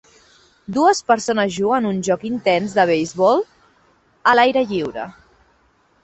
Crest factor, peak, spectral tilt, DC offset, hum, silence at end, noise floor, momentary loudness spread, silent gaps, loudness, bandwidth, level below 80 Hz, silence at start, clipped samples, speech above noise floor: 18 dB; -2 dBFS; -4.5 dB/octave; under 0.1%; none; 0.95 s; -59 dBFS; 11 LU; none; -18 LUFS; 8.4 kHz; -58 dBFS; 0.7 s; under 0.1%; 42 dB